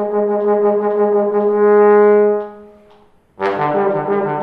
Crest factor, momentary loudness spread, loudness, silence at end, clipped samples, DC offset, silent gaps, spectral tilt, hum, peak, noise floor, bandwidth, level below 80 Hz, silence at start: 12 dB; 10 LU; -14 LUFS; 0 s; under 0.1%; under 0.1%; none; -9.5 dB/octave; none; -2 dBFS; -49 dBFS; 4.5 kHz; -62 dBFS; 0 s